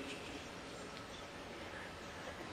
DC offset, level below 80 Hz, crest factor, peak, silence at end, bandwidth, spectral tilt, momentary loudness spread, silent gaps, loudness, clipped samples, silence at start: under 0.1%; -64 dBFS; 16 dB; -34 dBFS; 0 s; 16.5 kHz; -3.5 dB/octave; 2 LU; none; -48 LUFS; under 0.1%; 0 s